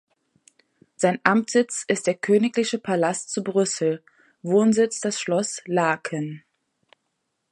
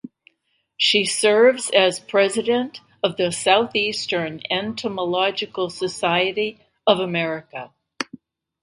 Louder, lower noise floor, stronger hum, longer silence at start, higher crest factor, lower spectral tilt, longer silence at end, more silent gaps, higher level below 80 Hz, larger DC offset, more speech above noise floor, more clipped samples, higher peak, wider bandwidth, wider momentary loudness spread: second, -23 LUFS vs -20 LUFS; first, -76 dBFS vs -70 dBFS; neither; first, 1 s vs 0.05 s; about the same, 24 dB vs 20 dB; first, -4.5 dB/octave vs -3 dB/octave; first, 1.15 s vs 0.45 s; neither; second, -72 dBFS vs -66 dBFS; neither; first, 54 dB vs 50 dB; neither; about the same, 0 dBFS vs 0 dBFS; about the same, 11.5 kHz vs 11.5 kHz; second, 9 LU vs 13 LU